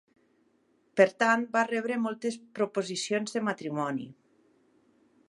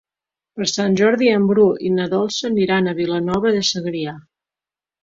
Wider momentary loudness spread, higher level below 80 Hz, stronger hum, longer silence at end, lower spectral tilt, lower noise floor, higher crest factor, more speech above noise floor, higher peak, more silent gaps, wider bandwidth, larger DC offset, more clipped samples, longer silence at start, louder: about the same, 11 LU vs 9 LU; second, -82 dBFS vs -56 dBFS; neither; first, 1.15 s vs 0.8 s; about the same, -4.5 dB/octave vs -5 dB/octave; second, -69 dBFS vs under -90 dBFS; first, 24 dB vs 16 dB; second, 40 dB vs over 73 dB; second, -8 dBFS vs -2 dBFS; neither; first, 11.5 kHz vs 7.8 kHz; neither; neither; first, 0.95 s vs 0.55 s; second, -29 LUFS vs -18 LUFS